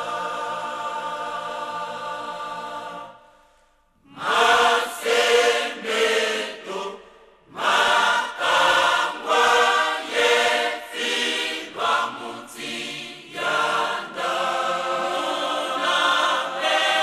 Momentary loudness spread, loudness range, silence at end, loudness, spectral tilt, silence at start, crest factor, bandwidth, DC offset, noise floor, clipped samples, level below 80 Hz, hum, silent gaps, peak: 14 LU; 10 LU; 0 s; -21 LUFS; -0.5 dB/octave; 0 s; 18 dB; 14 kHz; under 0.1%; -60 dBFS; under 0.1%; -64 dBFS; none; none; -4 dBFS